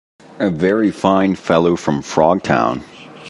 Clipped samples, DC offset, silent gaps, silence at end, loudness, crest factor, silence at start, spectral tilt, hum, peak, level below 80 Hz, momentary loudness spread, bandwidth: under 0.1%; under 0.1%; none; 0 s; -16 LUFS; 16 dB; 0.35 s; -6.5 dB/octave; none; 0 dBFS; -46 dBFS; 6 LU; 11.5 kHz